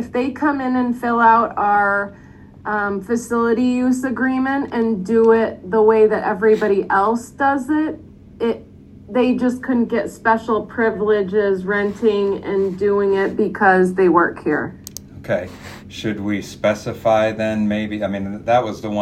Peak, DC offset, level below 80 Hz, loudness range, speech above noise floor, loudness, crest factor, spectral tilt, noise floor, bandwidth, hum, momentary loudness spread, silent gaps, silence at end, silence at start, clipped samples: 0 dBFS; under 0.1%; -52 dBFS; 4 LU; 24 dB; -18 LUFS; 18 dB; -6.5 dB/octave; -41 dBFS; 15.5 kHz; none; 10 LU; none; 0 s; 0 s; under 0.1%